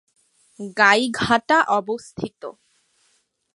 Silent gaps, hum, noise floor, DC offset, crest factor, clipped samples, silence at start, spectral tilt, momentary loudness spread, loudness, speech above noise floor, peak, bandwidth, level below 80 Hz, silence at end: none; none; -66 dBFS; under 0.1%; 22 dB; under 0.1%; 0.6 s; -3.5 dB/octave; 21 LU; -19 LUFS; 46 dB; -2 dBFS; 11.5 kHz; -56 dBFS; 1.05 s